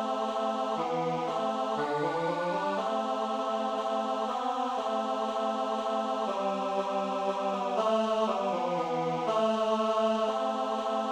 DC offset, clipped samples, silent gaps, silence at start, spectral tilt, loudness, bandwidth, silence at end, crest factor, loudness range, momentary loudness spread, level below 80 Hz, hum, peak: under 0.1%; under 0.1%; none; 0 s; -5 dB/octave; -30 LUFS; 11.5 kHz; 0 s; 14 dB; 2 LU; 4 LU; -74 dBFS; none; -16 dBFS